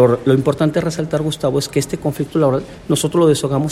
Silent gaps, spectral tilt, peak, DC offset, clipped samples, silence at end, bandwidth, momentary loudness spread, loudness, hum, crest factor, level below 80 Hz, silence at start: none; -6 dB/octave; -2 dBFS; under 0.1%; under 0.1%; 0 s; 16 kHz; 6 LU; -17 LUFS; none; 14 dB; -44 dBFS; 0 s